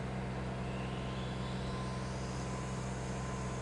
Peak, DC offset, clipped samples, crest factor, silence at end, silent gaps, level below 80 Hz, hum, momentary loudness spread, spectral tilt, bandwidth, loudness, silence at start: -28 dBFS; under 0.1%; under 0.1%; 12 dB; 0 s; none; -48 dBFS; none; 1 LU; -6 dB/octave; 11.5 kHz; -40 LUFS; 0 s